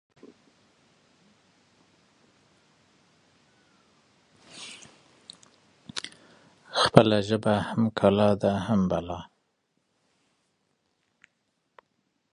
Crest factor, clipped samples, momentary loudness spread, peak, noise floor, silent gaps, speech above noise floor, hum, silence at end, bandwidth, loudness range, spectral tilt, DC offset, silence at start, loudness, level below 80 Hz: 30 dB; under 0.1%; 27 LU; 0 dBFS; -76 dBFS; none; 53 dB; none; 3.1 s; 11 kHz; 20 LU; -6 dB/octave; under 0.1%; 4.55 s; -25 LUFS; -56 dBFS